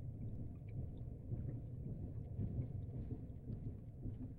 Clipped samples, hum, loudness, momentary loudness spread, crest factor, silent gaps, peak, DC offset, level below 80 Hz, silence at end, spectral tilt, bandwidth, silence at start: under 0.1%; none; -48 LUFS; 5 LU; 14 dB; none; -32 dBFS; under 0.1%; -54 dBFS; 0 s; -11.5 dB/octave; 3.6 kHz; 0 s